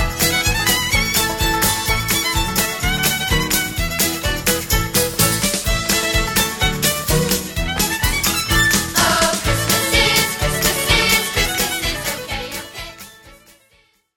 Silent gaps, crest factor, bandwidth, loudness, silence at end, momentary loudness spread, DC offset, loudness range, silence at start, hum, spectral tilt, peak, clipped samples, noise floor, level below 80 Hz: none; 18 dB; over 20 kHz; -16 LUFS; 0.85 s; 6 LU; under 0.1%; 2 LU; 0 s; none; -2.5 dB/octave; -2 dBFS; under 0.1%; -57 dBFS; -28 dBFS